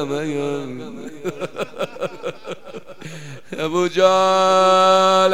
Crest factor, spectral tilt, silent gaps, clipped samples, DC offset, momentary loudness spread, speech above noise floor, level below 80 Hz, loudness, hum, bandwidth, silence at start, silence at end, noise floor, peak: 18 dB; -4 dB/octave; none; under 0.1%; 1%; 21 LU; 19 dB; -62 dBFS; -17 LUFS; none; 15.5 kHz; 0 s; 0 s; -37 dBFS; -2 dBFS